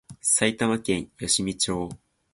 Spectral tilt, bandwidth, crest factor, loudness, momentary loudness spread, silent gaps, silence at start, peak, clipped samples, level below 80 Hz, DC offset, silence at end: -2.5 dB/octave; 11.5 kHz; 20 dB; -24 LUFS; 8 LU; none; 0.1 s; -6 dBFS; under 0.1%; -52 dBFS; under 0.1%; 0.35 s